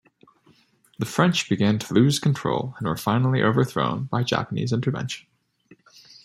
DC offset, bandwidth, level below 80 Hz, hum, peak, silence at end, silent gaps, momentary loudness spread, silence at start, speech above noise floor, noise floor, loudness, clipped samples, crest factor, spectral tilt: under 0.1%; 14.5 kHz; -60 dBFS; none; -4 dBFS; 1.05 s; none; 8 LU; 1 s; 37 dB; -60 dBFS; -23 LUFS; under 0.1%; 20 dB; -6 dB/octave